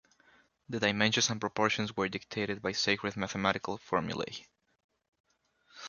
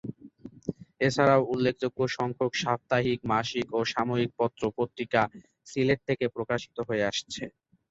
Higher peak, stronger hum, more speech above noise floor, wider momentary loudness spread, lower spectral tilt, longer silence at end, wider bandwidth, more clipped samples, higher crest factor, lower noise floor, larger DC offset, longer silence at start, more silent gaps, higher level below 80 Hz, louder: about the same, -10 dBFS vs -8 dBFS; neither; first, 36 dB vs 21 dB; second, 10 LU vs 14 LU; second, -3.5 dB/octave vs -5.5 dB/octave; second, 0 s vs 0.4 s; about the same, 7.4 kHz vs 8 kHz; neither; about the same, 24 dB vs 20 dB; first, -68 dBFS vs -49 dBFS; neither; first, 0.7 s vs 0.05 s; first, 4.84-4.89 s, 5.08-5.12 s, 5.20-5.24 s vs none; about the same, -64 dBFS vs -60 dBFS; second, -32 LUFS vs -28 LUFS